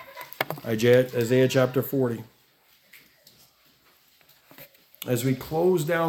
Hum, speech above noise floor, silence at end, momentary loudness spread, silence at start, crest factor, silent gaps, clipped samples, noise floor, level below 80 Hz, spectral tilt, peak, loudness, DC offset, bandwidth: none; 39 dB; 0 s; 12 LU; 0 s; 20 dB; none; under 0.1%; -61 dBFS; -64 dBFS; -6 dB/octave; -6 dBFS; -24 LUFS; under 0.1%; 18 kHz